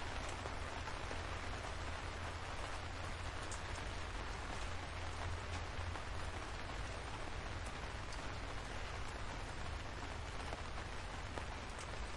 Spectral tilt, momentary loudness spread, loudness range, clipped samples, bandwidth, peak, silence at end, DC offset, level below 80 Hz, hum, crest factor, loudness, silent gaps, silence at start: -4 dB/octave; 2 LU; 1 LU; under 0.1%; 11.5 kHz; -26 dBFS; 0 s; under 0.1%; -50 dBFS; none; 18 dB; -46 LUFS; none; 0 s